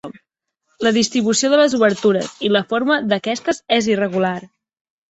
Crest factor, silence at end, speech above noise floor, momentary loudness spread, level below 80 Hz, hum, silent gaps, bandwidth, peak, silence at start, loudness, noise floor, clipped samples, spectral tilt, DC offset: 18 dB; 0.65 s; 57 dB; 7 LU; -60 dBFS; none; none; 8.2 kHz; -2 dBFS; 0.05 s; -17 LUFS; -74 dBFS; under 0.1%; -4 dB/octave; under 0.1%